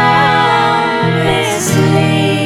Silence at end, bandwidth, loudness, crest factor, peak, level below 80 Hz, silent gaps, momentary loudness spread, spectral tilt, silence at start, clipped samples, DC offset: 0 s; 16.5 kHz; -11 LUFS; 10 dB; 0 dBFS; -44 dBFS; none; 3 LU; -5 dB/octave; 0 s; under 0.1%; under 0.1%